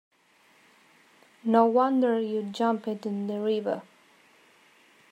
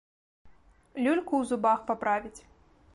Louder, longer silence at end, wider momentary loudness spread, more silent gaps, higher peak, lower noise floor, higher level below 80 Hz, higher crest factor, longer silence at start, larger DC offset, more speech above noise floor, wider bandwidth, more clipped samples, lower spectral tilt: about the same, -26 LUFS vs -28 LUFS; first, 1.3 s vs 0.55 s; about the same, 11 LU vs 10 LU; neither; first, -10 dBFS vs -14 dBFS; first, -62 dBFS vs -57 dBFS; second, -84 dBFS vs -64 dBFS; about the same, 20 dB vs 18 dB; first, 1.45 s vs 0.45 s; neither; first, 37 dB vs 30 dB; about the same, 10.5 kHz vs 11.5 kHz; neither; first, -7 dB/octave vs -5 dB/octave